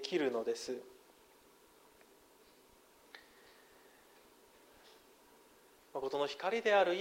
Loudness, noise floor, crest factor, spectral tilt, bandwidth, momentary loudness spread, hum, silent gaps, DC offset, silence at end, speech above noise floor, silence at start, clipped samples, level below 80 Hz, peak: -36 LUFS; -65 dBFS; 22 dB; -3.5 dB/octave; 16 kHz; 30 LU; none; none; under 0.1%; 0 s; 30 dB; 0 s; under 0.1%; -80 dBFS; -18 dBFS